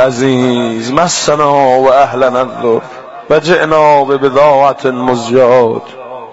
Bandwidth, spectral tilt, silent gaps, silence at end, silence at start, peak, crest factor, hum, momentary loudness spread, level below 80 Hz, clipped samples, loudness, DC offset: 8 kHz; -4.5 dB/octave; none; 0 s; 0 s; 0 dBFS; 10 dB; none; 7 LU; -46 dBFS; under 0.1%; -10 LUFS; under 0.1%